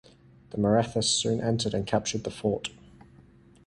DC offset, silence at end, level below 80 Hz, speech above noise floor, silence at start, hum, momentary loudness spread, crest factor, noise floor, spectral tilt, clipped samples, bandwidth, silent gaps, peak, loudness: under 0.1%; 0.45 s; -54 dBFS; 28 dB; 0.5 s; none; 9 LU; 20 dB; -55 dBFS; -4.5 dB/octave; under 0.1%; 11.5 kHz; none; -10 dBFS; -27 LUFS